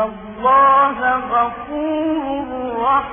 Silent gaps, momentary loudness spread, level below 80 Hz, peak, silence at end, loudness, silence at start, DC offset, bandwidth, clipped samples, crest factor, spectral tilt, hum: none; 12 LU; -46 dBFS; -4 dBFS; 0 s; -17 LUFS; 0 s; under 0.1%; 3.6 kHz; under 0.1%; 12 dB; 1 dB/octave; none